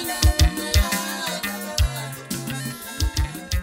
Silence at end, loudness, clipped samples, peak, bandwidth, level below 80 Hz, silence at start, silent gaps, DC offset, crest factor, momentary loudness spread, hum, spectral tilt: 0 s; -24 LUFS; under 0.1%; -6 dBFS; 16.5 kHz; -26 dBFS; 0 s; none; under 0.1%; 16 dB; 10 LU; none; -3.5 dB/octave